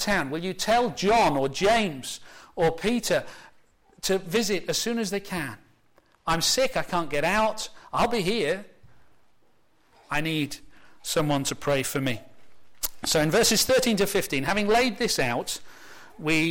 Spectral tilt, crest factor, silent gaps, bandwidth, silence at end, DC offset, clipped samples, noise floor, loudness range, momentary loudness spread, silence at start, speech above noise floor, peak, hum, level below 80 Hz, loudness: -3.5 dB/octave; 14 dB; none; 16.5 kHz; 0 s; under 0.1%; under 0.1%; -66 dBFS; 6 LU; 12 LU; 0 s; 41 dB; -12 dBFS; none; -48 dBFS; -25 LUFS